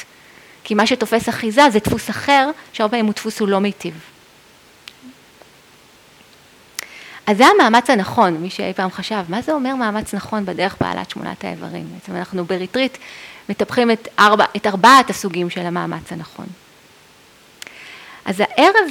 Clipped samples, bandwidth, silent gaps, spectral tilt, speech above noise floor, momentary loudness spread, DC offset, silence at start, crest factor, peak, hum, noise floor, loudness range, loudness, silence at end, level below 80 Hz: under 0.1%; 18.5 kHz; none; -4.5 dB/octave; 31 dB; 20 LU; under 0.1%; 0 s; 18 dB; 0 dBFS; none; -48 dBFS; 11 LU; -16 LUFS; 0 s; -52 dBFS